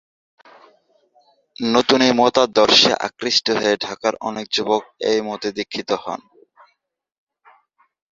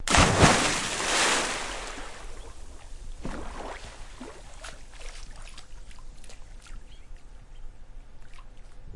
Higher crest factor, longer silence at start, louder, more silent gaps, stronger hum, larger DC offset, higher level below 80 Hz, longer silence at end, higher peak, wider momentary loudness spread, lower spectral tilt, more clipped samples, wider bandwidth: second, 20 dB vs 26 dB; first, 1.6 s vs 0 s; first, -18 LUFS vs -24 LUFS; neither; neither; neither; second, -60 dBFS vs -40 dBFS; first, 1.95 s vs 0 s; about the same, 0 dBFS vs -2 dBFS; second, 13 LU vs 29 LU; about the same, -3 dB/octave vs -3 dB/octave; neither; second, 7.6 kHz vs 11.5 kHz